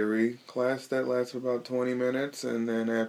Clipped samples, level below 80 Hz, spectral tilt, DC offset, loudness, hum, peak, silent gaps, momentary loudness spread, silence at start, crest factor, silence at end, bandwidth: under 0.1%; -82 dBFS; -5.5 dB/octave; under 0.1%; -30 LUFS; none; -14 dBFS; none; 3 LU; 0 s; 16 dB; 0 s; 15.5 kHz